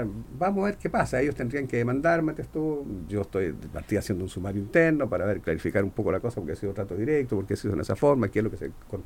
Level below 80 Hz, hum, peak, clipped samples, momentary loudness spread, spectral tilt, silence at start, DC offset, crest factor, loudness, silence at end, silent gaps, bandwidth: -46 dBFS; none; -8 dBFS; under 0.1%; 9 LU; -7.5 dB/octave; 0 s; under 0.1%; 20 dB; -27 LUFS; 0 s; none; 17 kHz